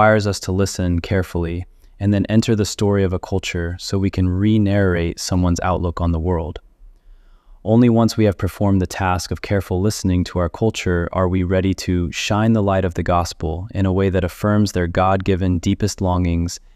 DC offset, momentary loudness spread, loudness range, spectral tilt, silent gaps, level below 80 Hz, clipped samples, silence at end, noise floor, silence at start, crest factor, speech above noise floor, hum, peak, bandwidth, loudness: under 0.1%; 7 LU; 2 LU; -6.5 dB/octave; none; -36 dBFS; under 0.1%; 0.15 s; -46 dBFS; 0 s; 16 dB; 28 dB; none; -2 dBFS; 14 kHz; -19 LUFS